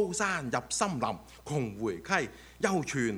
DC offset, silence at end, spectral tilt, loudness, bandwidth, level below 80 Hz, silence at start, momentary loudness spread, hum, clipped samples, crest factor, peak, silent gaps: under 0.1%; 0 s; -4 dB/octave; -32 LUFS; over 20 kHz; -58 dBFS; 0 s; 6 LU; none; under 0.1%; 22 dB; -10 dBFS; none